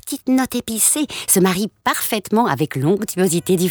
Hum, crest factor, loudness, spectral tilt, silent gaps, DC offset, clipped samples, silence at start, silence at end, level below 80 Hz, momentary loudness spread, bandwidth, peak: none; 16 dB; -18 LUFS; -4 dB/octave; none; under 0.1%; under 0.1%; 0.05 s; 0 s; -54 dBFS; 5 LU; over 20 kHz; -2 dBFS